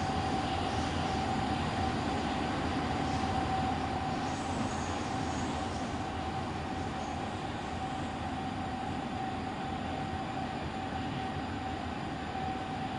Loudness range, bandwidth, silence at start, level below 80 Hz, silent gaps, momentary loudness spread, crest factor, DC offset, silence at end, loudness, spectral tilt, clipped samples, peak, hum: 4 LU; 11 kHz; 0 s; -50 dBFS; none; 5 LU; 16 dB; under 0.1%; 0 s; -35 LUFS; -5.5 dB/octave; under 0.1%; -20 dBFS; none